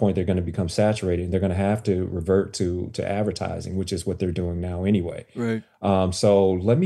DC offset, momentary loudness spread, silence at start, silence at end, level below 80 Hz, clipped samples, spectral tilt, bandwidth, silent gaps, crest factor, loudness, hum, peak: under 0.1%; 8 LU; 0 s; 0 s; -46 dBFS; under 0.1%; -6.5 dB/octave; 12.5 kHz; none; 16 dB; -24 LUFS; none; -6 dBFS